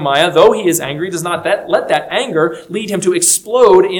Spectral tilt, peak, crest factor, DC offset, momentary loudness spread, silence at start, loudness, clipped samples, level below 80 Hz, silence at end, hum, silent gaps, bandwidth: -3 dB/octave; 0 dBFS; 12 dB; under 0.1%; 10 LU; 0 s; -13 LUFS; 0.5%; -54 dBFS; 0 s; none; none; 19.5 kHz